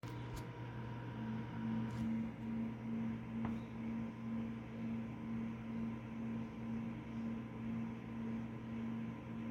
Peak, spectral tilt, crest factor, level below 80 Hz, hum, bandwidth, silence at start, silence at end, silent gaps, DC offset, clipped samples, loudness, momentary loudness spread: -28 dBFS; -8 dB/octave; 14 dB; -62 dBFS; none; 7.6 kHz; 0.05 s; 0 s; none; under 0.1%; under 0.1%; -44 LUFS; 5 LU